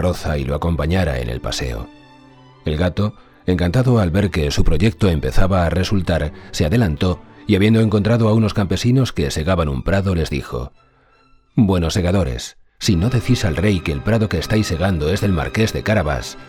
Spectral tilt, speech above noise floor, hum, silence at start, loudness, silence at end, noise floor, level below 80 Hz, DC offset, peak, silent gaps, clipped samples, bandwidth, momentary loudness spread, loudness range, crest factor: -6.5 dB/octave; 37 dB; none; 0 s; -18 LUFS; 0 s; -54 dBFS; -28 dBFS; under 0.1%; 0 dBFS; none; under 0.1%; 15.5 kHz; 9 LU; 4 LU; 16 dB